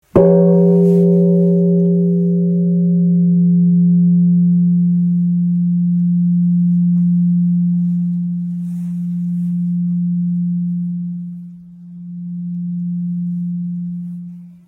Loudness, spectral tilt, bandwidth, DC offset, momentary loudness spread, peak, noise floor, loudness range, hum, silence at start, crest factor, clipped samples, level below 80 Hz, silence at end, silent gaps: -15 LUFS; -13.5 dB/octave; 1.6 kHz; under 0.1%; 14 LU; 0 dBFS; -35 dBFS; 10 LU; none; 0.15 s; 14 dB; under 0.1%; -52 dBFS; 0.15 s; none